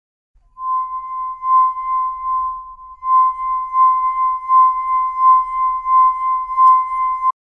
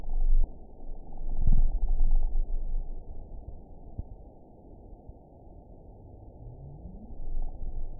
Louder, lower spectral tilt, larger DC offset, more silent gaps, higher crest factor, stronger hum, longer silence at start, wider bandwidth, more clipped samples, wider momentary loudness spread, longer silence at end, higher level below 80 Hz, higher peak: first, -16 LUFS vs -37 LUFS; second, -2.5 dB/octave vs -15.5 dB/octave; neither; neither; about the same, 12 dB vs 16 dB; neither; first, 0.6 s vs 0 s; first, 2.2 kHz vs 0.9 kHz; neither; second, 12 LU vs 20 LU; first, 0.2 s vs 0 s; second, -52 dBFS vs -28 dBFS; first, -4 dBFS vs -10 dBFS